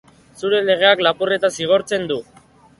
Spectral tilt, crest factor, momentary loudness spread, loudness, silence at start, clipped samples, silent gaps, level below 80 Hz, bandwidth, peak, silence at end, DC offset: -3.5 dB/octave; 18 dB; 12 LU; -17 LUFS; 0.4 s; under 0.1%; none; -60 dBFS; 11.5 kHz; 0 dBFS; 0.55 s; under 0.1%